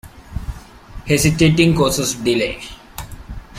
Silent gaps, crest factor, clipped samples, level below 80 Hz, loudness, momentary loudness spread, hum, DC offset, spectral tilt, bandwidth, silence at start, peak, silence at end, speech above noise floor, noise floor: none; 18 dB; under 0.1%; -34 dBFS; -16 LUFS; 21 LU; none; under 0.1%; -4.5 dB/octave; 16 kHz; 0.05 s; -2 dBFS; 0 s; 20 dB; -36 dBFS